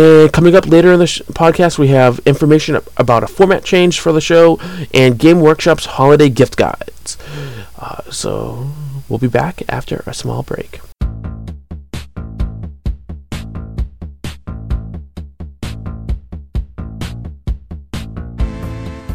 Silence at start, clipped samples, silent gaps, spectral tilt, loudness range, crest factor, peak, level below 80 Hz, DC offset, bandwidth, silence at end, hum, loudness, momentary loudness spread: 0 s; under 0.1%; none; -6 dB/octave; 16 LU; 14 dB; 0 dBFS; -28 dBFS; 2%; 18 kHz; 0 s; none; -12 LUFS; 20 LU